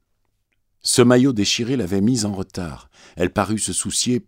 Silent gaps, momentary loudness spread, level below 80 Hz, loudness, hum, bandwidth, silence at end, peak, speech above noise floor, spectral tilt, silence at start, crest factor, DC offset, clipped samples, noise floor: none; 14 LU; -50 dBFS; -19 LUFS; none; 16 kHz; 0.05 s; 0 dBFS; 49 dB; -4 dB/octave; 0.85 s; 20 dB; under 0.1%; under 0.1%; -69 dBFS